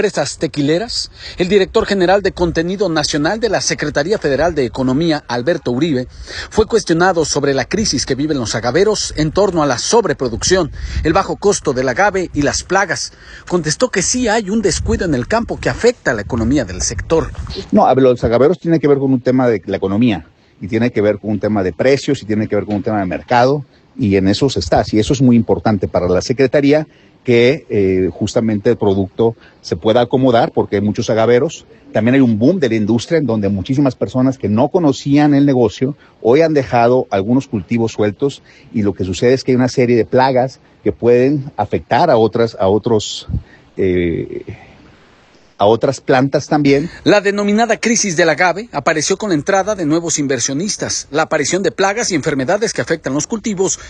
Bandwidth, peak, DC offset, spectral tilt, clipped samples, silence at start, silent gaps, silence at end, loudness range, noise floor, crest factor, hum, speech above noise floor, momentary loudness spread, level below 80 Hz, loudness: 11 kHz; 0 dBFS; under 0.1%; -5 dB/octave; under 0.1%; 0 s; none; 0 s; 3 LU; -47 dBFS; 14 dB; none; 33 dB; 7 LU; -36 dBFS; -15 LUFS